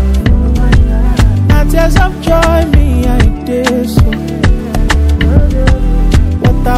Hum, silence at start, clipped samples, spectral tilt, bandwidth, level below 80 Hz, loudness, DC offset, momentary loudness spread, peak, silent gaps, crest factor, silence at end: none; 0 s; 2%; -6.5 dB/octave; 14.5 kHz; -10 dBFS; -11 LUFS; under 0.1%; 3 LU; 0 dBFS; none; 8 dB; 0 s